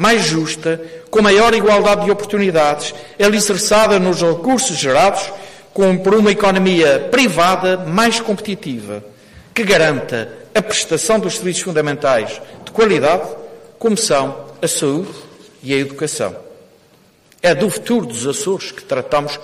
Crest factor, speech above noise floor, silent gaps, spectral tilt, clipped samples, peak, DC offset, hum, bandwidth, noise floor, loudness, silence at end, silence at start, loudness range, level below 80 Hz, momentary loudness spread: 12 dB; 36 dB; none; -4 dB/octave; under 0.1%; -4 dBFS; under 0.1%; none; 15.5 kHz; -50 dBFS; -15 LUFS; 0 s; 0 s; 6 LU; -46 dBFS; 13 LU